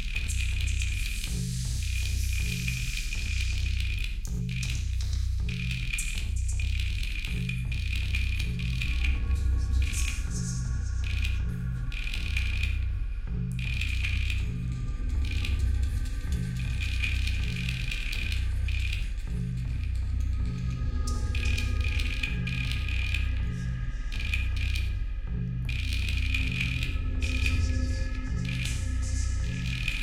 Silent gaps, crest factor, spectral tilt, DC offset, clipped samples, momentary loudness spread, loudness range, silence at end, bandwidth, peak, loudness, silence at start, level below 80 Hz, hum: none; 16 dB; -4 dB/octave; under 0.1%; under 0.1%; 4 LU; 2 LU; 0 s; 14.5 kHz; -12 dBFS; -31 LUFS; 0 s; -30 dBFS; none